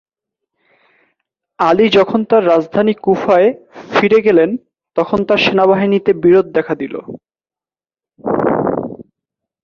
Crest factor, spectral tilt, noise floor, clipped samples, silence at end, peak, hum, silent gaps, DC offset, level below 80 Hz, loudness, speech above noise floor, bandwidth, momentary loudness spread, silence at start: 14 dB; -7 dB/octave; under -90 dBFS; under 0.1%; 0.6 s; 0 dBFS; none; none; under 0.1%; -52 dBFS; -13 LUFS; over 78 dB; 7 kHz; 13 LU; 1.6 s